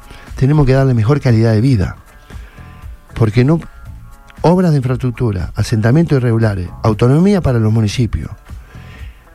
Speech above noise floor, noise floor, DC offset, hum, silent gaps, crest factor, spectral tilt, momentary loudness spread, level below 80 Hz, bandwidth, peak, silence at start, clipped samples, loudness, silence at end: 23 dB; -35 dBFS; under 0.1%; none; none; 14 dB; -8 dB/octave; 22 LU; -30 dBFS; 12 kHz; 0 dBFS; 0.1 s; under 0.1%; -14 LUFS; 0.2 s